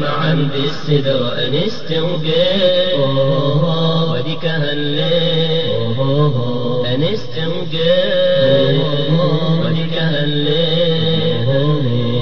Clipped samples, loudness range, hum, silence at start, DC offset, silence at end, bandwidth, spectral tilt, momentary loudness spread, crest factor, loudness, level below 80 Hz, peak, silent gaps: under 0.1%; 2 LU; none; 0 s; 8%; 0 s; 6.6 kHz; -7.5 dB/octave; 6 LU; 14 dB; -16 LUFS; -48 dBFS; -2 dBFS; none